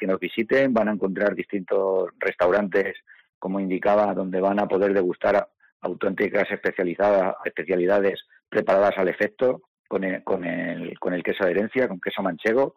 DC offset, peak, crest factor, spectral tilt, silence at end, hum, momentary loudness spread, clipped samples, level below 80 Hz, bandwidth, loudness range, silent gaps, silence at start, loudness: under 0.1%; -12 dBFS; 12 dB; -7.5 dB/octave; 0.05 s; none; 9 LU; under 0.1%; -64 dBFS; 14.5 kHz; 2 LU; 3.29-3.41 s, 5.72-5.80 s, 9.68-9.84 s; 0 s; -23 LUFS